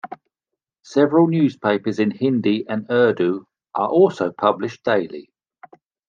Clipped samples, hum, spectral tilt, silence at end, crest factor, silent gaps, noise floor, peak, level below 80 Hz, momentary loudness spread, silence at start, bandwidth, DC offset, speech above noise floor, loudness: under 0.1%; none; -7.5 dB/octave; 0.9 s; 18 dB; none; -84 dBFS; -2 dBFS; -72 dBFS; 11 LU; 0.05 s; 7.4 kHz; under 0.1%; 66 dB; -19 LUFS